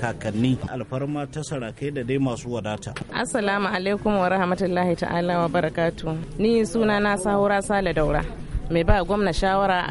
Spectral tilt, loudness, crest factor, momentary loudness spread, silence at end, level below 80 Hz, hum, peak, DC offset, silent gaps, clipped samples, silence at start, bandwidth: -6 dB/octave; -24 LUFS; 18 dB; 9 LU; 0 s; -34 dBFS; none; -4 dBFS; under 0.1%; none; under 0.1%; 0 s; 11.5 kHz